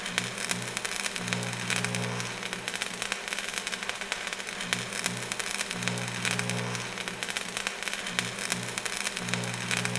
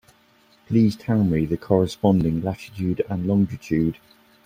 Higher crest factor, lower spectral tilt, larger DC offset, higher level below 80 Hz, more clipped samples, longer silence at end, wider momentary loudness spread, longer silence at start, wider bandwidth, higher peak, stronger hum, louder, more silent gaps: first, 28 dB vs 18 dB; second, -2.5 dB/octave vs -8.5 dB/octave; neither; second, -60 dBFS vs -48 dBFS; neither; second, 0 s vs 0.55 s; second, 4 LU vs 7 LU; second, 0 s vs 0.7 s; second, 11 kHz vs 15.5 kHz; about the same, -4 dBFS vs -4 dBFS; neither; second, -31 LUFS vs -22 LUFS; neither